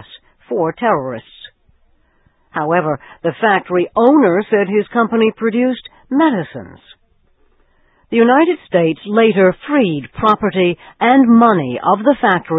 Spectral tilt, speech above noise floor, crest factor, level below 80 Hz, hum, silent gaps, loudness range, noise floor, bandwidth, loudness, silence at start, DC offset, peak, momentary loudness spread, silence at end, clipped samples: -9 dB/octave; 43 dB; 14 dB; -54 dBFS; none; none; 6 LU; -56 dBFS; 4 kHz; -14 LUFS; 0.15 s; under 0.1%; 0 dBFS; 11 LU; 0 s; under 0.1%